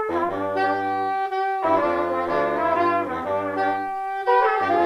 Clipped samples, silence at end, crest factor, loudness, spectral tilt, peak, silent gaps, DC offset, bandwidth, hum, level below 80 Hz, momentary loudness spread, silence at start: under 0.1%; 0 s; 14 dB; -22 LUFS; -6.5 dB/octave; -8 dBFS; none; under 0.1%; 13.5 kHz; none; -58 dBFS; 6 LU; 0 s